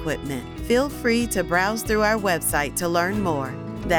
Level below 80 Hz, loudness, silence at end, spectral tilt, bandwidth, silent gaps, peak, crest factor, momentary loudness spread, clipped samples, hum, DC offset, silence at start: -40 dBFS; -23 LUFS; 0 s; -4 dB/octave; over 20 kHz; none; -8 dBFS; 14 dB; 9 LU; under 0.1%; none; under 0.1%; 0 s